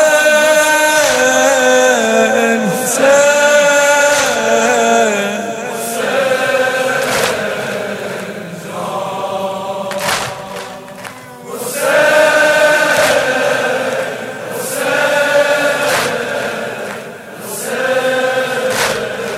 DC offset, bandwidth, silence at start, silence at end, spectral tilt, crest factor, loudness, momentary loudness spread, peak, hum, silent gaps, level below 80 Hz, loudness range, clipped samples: under 0.1%; 16 kHz; 0 s; 0 s; -2 dB/octave; 14 dB; -13 LUFS; 14 LU; 0 dBFS; none; none; -54 dBFS; 9 LU; under 0.1%